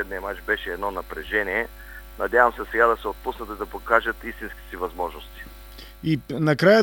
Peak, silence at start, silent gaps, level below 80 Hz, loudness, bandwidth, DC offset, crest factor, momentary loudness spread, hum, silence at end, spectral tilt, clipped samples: -2 dBFS; 0 s; none; -44 dBFS; -24 LUFS; over 20 kHz; under 0.1%; 24 dB; 21 LU; 50 Hz at -45 dBFS; 0 s; -6 dB/octave; under 0.1%